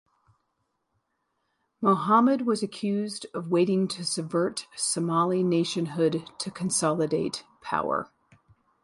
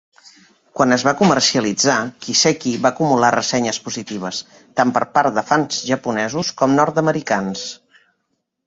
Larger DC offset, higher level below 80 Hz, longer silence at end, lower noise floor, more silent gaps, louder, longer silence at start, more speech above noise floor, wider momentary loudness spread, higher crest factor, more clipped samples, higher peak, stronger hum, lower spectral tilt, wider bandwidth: neither; second, -70 dBFS vs -58 dBFS; about the same, 0.8 s vs 0.9 s; first, -77 dBFS vs -72 dBFS; neither; second, -26 LUFS vs -17 LUFS; first, 1.8 s vs 0.75 s; second, 51 dB vs 55 dB; about the same, 11 LU vs 11 LU; about the same, 20 dB vs 18 dB; neither; second, -8 dBFS vs -2 dBFS; neither; first, -5 dB/octave vs -3.5 dB/octave; first, 11.5 kHz vs 8 kHz